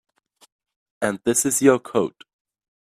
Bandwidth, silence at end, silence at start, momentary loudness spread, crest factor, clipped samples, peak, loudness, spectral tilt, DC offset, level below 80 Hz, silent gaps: 15.5 kHz; 0.9 s; 1 s; 10 LU; 22 dB; under 0.1%; -2 dBFS; -20 LUFS; -4 dB/octave; under 0.1%; -64 dBFS; none